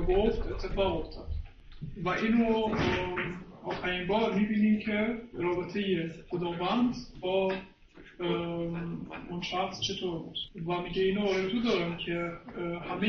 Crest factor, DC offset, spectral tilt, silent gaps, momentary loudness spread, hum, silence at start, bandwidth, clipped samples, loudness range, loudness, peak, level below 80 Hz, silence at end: 16 dB; under 0.1%; -6 dB/octave; none; 11 LU; none; 0 s; 6.8 kHz; under 0.1%; 4 LU; -31 LUFS; -14 dBFS; -44 dBFS; 0 s